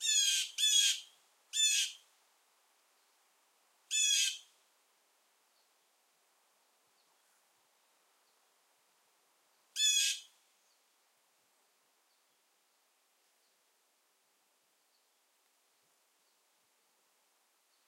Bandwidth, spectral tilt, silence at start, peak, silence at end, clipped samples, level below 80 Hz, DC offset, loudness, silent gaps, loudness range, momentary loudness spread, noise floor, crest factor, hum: 16 kHz; 8.5 dB/octave; 0 s; -16 dBFS; 7.65 s; under 0.1%; under -90 dBFS; under 0.1%; -30 LUFS; none; 5 LU; 12 LU; -75 dBFS; 24 dB; none